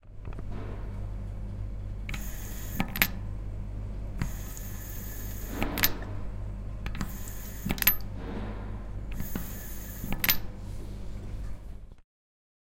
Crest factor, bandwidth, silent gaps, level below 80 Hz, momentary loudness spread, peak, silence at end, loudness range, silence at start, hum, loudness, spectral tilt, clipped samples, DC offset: 32 dB; 17 kHz; none; -38 dBFS; 15 LU; -2 dBFS; 0.6 s; 3 LU; 0.05 s; 50 Hz at -45 dBFS; -34 LUFS; -3.5 dB/octave; under 0.1%; under 0.1%